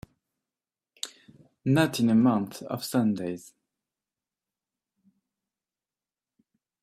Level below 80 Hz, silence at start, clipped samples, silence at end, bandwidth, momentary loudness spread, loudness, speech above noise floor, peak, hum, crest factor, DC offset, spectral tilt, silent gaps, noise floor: -68 dBFS; 1.05 s; under 0.1%; 3.45 s; 15.5 kHz; 17 LU; -26 LUFS; over 65 dB; -8 dBFS; none; 22 dB; under 0.1%; -6 dB/octave; none; under -90 dBFS